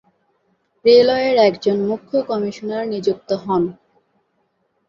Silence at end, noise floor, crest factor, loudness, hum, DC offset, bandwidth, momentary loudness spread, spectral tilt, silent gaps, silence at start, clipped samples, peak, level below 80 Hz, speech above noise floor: 1.15 s; -67 dBFS; 18 dB; -18 LUFS; none; under 0.1%; 7.2 kHz; 11 LU; -6 dB/octave; none; 0.85 s; under 0.1%; -2 dBFS; -60 dBFS; 50 dB